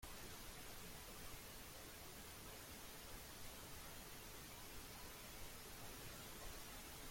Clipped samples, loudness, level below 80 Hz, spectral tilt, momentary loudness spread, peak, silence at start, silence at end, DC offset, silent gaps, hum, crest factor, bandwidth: under 0.1%; -55 LUFS; -62 dBFS; -2.5 dB/octave; 1 LU; -40 dBFS; 0 s; 0 s; under 0.1%; none; none; 16 dB; 16.5 kHz